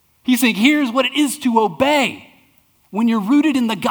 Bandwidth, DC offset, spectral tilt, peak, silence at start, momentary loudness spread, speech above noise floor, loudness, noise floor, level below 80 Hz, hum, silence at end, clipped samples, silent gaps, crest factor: over 20 kHz; under 0.1%; -4 dB/octave; 0 dBFS; 0.25 s; 6 LU; 40 dB; -16 LUFS; -56 dBFS; -60 dBFS; none; 0 s; under 0.1%; none; 18 dB